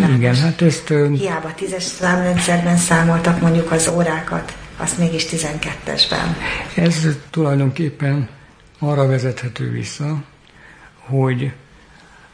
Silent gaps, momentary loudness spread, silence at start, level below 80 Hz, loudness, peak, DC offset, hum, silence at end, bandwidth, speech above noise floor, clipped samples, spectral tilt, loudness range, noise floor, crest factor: none; 10 LU; 0 s; -42 dBFS; -18 LUFS; -2 dBFS; under 0.1%; none; 0.75 s; 10.5 kHz; 28 dB; under 0.1%; -5 dB/octave; 6 LU; -45 dBFS; 16 dB